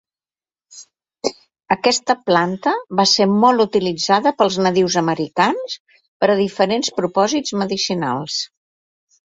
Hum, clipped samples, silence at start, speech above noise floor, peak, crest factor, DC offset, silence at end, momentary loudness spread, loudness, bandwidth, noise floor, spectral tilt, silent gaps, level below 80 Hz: none; under 0.1%; 0.75 s; over 73 dB; -2 dBFS; 18 dB; under 0.1%; 0.95 s; 11 LU; -17 LUFS; 8.2 kHz; under -90 dBFS; -4 dB/octave; 5.80-5.85 s, 6.08-6.20 s; -60 dBFS